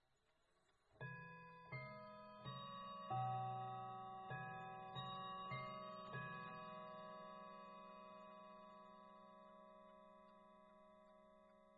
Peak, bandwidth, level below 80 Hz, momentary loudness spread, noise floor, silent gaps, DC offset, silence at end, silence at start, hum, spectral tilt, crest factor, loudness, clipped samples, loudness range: -34 dBFS; 7 kHz; -84 dBFS; 18 LU; -83 dBFS; none; under 0.1%; 0 s; 0.9 s; none; -4 dB/octave; 20 dB; -53 LUFS; under 0.1%; 13 LU